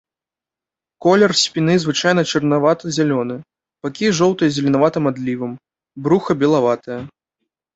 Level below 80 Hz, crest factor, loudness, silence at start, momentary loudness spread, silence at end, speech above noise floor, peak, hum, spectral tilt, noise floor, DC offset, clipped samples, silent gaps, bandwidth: -58 dBFS; 18 dB; -17 LUFS; 1 s; 13 LU; 0.65 s; 72 dB; 0 dBFS; none; -5 dB/octave; -89 dBFS; under 0.1%; under 0.1%; none; 8.2 kHz